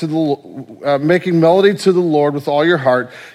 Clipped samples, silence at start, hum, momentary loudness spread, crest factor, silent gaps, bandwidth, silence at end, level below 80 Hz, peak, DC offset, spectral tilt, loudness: under 0.1%; 0 s; none; 9 LU; 14 dB; none; 14 kHz; 0.05 s; -62 dBFS; 0 dBFS; under 0.1%; -6.5 dB/octave; -14 LUFS